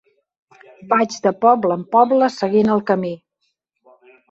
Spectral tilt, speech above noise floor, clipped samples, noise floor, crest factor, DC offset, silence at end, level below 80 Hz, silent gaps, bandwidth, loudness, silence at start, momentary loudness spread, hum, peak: -6 dB/octave; 55 dB; under 0.1%; -72 dBFS; 18 dB; under 0.1%; 1.15 s; -62 dBFS; none; 8 kHz; -17 LUFS; 0.8 s; 6 LU; none; -2 dBFS